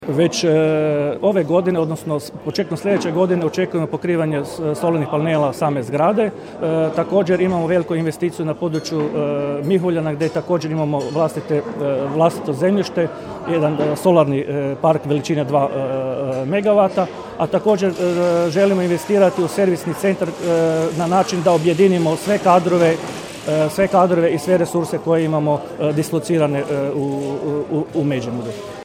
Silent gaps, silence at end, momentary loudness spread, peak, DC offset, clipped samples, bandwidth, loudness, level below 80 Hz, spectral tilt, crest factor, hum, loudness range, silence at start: none; 0 s; 7 LU; 0 dBFS; under 0.1%; under 0.1%; 16.5 kHz; -18 LUFS; -56 dBFS; -6.5 dB/octave; 18 dB; none; 4 LU; 0 s